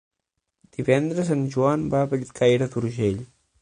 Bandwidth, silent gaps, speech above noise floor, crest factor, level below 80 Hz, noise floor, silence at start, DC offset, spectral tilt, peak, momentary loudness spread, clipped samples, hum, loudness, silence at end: 10.5 kHz; none; 58 dB; 20 dB; -54 dBFS; -80 dBFS; 0.8 s; under 0.1%; -7 dB/octave; -4 dBFS; 7 LU; under 0.1%; none; -23 LUFS; 0.35 s